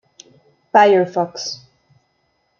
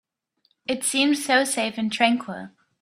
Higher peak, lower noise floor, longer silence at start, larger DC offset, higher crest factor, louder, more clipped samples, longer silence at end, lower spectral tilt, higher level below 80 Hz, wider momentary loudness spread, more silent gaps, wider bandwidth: about the same, -2 dBFS vs -2 dBFS; about the same, -66 dBFS vs -69 dBFS; about the same, 0.75 s vs 0.7 s; neither; about the same, 18 dB vs 22 dB; first, -16 LUFS vs -22 LUFS; neither; first, 1.05 s vs 0.35 s; first, -4.5 dB/octave vs -2 dB/octave; about the same, -72 dBFS vs -70 dBFS; about the same, 16 LU vs 16 LU; neither; second, 7.2 kHz vs 15.5 kHz